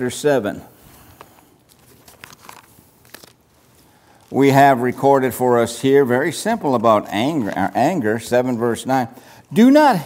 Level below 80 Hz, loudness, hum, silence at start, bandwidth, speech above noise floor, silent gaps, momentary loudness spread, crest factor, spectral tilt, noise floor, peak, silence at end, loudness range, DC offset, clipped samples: -60 dBFS; -17 LUFS; none; 0 s; 16 kHz; 38 dB; none; 9 LU; 18 dB; -5.5 dB/octave; -53 dBFS; 0 dBFS; 0 s; 10 LU; under 0.1%; under 0.1%